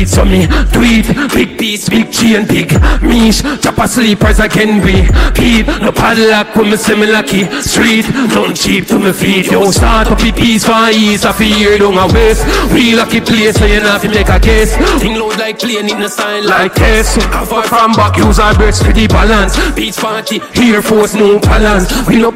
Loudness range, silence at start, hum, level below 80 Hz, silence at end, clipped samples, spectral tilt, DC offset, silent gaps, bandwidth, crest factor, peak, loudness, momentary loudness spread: 2 LU; 0 s; none; -16 dBFS; 0 s; under 0.1%; -4.5 dB/octave; under 0.1%; none; 16.5 kHz; 8 dB; 0 dBFS; -9 LUFS; 5 LU